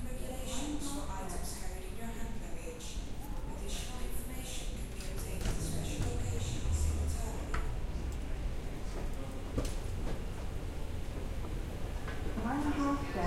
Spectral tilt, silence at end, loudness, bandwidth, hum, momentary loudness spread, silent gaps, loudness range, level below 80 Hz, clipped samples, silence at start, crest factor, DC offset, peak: -5 dB/octave; 0 s; -40 LUFS; 16 kHz; none; 9 LU; none; 5 LU; -38 dBFS; under 0.1%; 0 s; 16 dB; under 0.1%; -20 dBFS